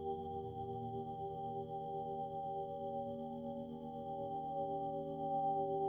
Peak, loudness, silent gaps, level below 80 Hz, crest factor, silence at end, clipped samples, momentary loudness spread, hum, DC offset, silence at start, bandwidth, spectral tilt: -28 dBFS; -43 LUFS; none; -70 dBFS; 14 dB; 0 s; under 0.1%; 7 LU; none; under 0.1%; 0 s; 3.7 kHz; -10 dB/octave